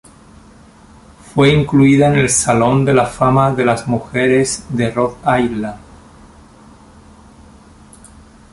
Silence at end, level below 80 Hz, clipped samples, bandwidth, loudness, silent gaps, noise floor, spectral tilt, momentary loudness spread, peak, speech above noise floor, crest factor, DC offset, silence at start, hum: 2.75 s; -42 dBFS; under 0.1%; 11.5 kHz; -14 LUFS; none; -43 dBFS; -5.5 dB/octave; 8 LU; 0 dBFS; 30 dB; 16 dB; under 0.1%; 1.35 s; none